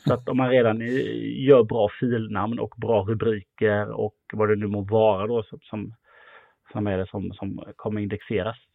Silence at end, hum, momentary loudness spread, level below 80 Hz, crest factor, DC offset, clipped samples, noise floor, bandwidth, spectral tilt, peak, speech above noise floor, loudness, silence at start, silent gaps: 0.2 s; none; 14 LU; -60 dBFS; 20 dB; under 0.1%; under 0.1%; -53 dBFS; 6.8 kHz; -9 dB/octave; -4 dBFS; 29 dB; -24 LUFS; 0.05 s; none